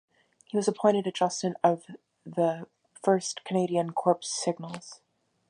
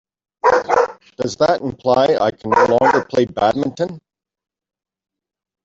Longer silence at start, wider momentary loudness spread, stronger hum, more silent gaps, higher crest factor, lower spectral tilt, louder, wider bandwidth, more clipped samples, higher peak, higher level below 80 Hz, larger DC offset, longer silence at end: about the same, 0.55 s vs 0.45 s; first, 14 LU vs 9 LU; neither; neither; about the same, 20 dB vs 16 dB; about the same, -5 dB/octave vs -5.5 dB/octave; second, -28 LUFS vs -17 LUFS; first, 11 kHz vs 7.8 kHz; neither; second, -10 dBFS vs -2 dBFS; second, -80 dBFS vs -54 dBFS; neither; second, 0.55 s vs 1.65 s